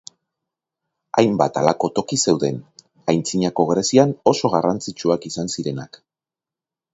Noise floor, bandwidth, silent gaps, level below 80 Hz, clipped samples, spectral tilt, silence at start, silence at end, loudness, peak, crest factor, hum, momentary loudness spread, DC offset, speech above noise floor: -89 dBFS; 8 kHz; none; -58 dBFS; under 0.1%; -5 dB/octave; 1.15 s; 1.05 s; -20 LUFS; 0 dBFS; 20 dB; none; 10 LU; under 0.1%; 70 dB